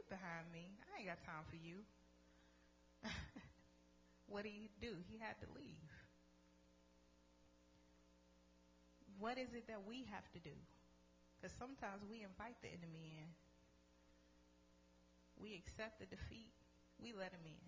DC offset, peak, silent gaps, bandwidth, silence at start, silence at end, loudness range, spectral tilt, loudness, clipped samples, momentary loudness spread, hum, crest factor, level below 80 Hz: under 0.1%; -34 dBFS; none; 8 kHz; 0 s; 0 s; 6 LU; -5 dB/octave; -55 LUFS; under 0.1%; 10 LU; 60 Hz at -75 dBFS; 24 dB; -72 dBFS